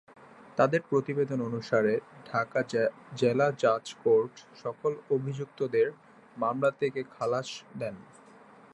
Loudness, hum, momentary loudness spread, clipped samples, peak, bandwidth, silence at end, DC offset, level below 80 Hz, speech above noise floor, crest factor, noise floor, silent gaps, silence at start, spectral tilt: -30 LUFS; none; 12 LU; under 0.1%; -10 dBFS; 11 kHz; 0.7 s; under 0.1%; -74 dBFS; 25 dB; 20 dB; -54 dBFS; none; 0.55 s; -6.5 dB/octave